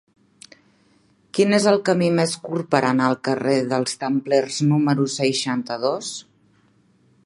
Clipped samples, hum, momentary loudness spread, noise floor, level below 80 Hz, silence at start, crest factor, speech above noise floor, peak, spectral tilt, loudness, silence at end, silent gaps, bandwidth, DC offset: under 0.1%; none; 7 LU; -59 dBFS; -68 dBFS; 1.35 s; 20 dB; 39 dB; 0 dBFS; -5 dB/octave; -21 LUFS; 1.05 s; none; 11.5 kHz; under 0.1%